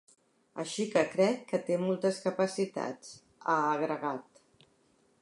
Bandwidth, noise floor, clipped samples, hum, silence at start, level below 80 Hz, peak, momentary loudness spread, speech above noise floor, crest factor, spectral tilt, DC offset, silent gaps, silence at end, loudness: 11.5 kHz; -69 dBFS; under 0.1%; none; 0.55 s; -80 dBFS; -14 dBFS; 12 LU; 38 dB; 18 dB; -5 dB/octave; under 0.1%; none; 1 s; -32 LUFS